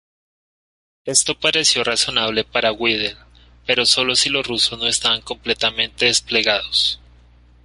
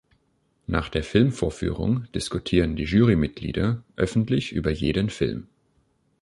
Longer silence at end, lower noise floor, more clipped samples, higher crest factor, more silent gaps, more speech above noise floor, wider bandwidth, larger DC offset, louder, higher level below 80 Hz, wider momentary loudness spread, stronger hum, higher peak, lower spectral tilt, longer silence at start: about the same, 0.7 s vs 0.8 s; second, -49 dBFS vs -68 dBFS; neither; about the same, 20 dB vs 20 dB; neither; second, 30 dB vs 45 dB; about the same, 11.5 kHz vs 11.5 kHz; neither; first, -17 LUFS vs -24 LUFS; second, -48 dBFS vs -38 dBFS; about the same, 7 LU vs 8 LU; first, 60 Hz at -45 dBFS vs none; first, 0 dBFS vs -4 dBFS; second, -1 dB/octave vs -6.5 dB/octave; first, 1.05 s vs 0.7 s